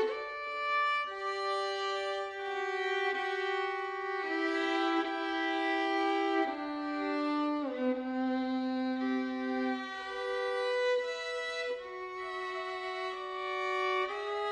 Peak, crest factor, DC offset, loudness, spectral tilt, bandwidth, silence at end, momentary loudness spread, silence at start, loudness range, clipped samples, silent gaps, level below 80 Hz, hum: -18 dBFS; 14 dB; under 0.1%; -33 LUFS; -2.5 dB/octave; 10 kHz; 0 s; 7 LU; 0 s; 3 LU; under 0.1%; none; -74 dBFS; none